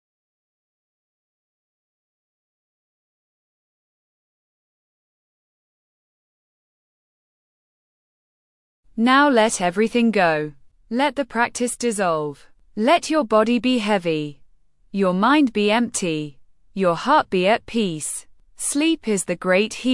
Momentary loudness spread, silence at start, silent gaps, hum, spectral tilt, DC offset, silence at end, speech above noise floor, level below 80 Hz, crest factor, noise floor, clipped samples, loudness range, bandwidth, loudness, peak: 11 LU; 8.95 s; none; none; -4 dB/octave; under 0.1%; 0 s; 33 dB; -58 dBFS; 18 dB; -52 dBFS; under 0.1%; 2 LU; 12 kHz; -20 LUFS; -4 dBFS